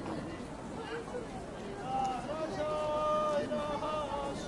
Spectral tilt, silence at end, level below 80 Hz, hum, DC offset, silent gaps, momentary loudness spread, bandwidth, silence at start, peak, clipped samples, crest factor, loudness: -5.5 dB/octave; 0 s; -54 dBFS; none; under 0.1%; none; 11 LU; 11.5 kHz; 0 s; -22 dBFS; under 0.1%; 14 dB; -36 LUFS